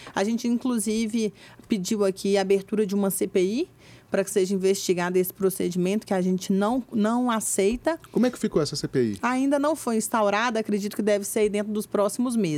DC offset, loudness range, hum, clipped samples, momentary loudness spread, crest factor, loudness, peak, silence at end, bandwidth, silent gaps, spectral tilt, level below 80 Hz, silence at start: under 0.1%; 1 LU; none; under 0.1%; 4 LU; 16 dB; -25 LUFS; -10 dBFS; 0 s; 16.5 kHz; none; -5 dB/octave; -58 dBFS; 0 s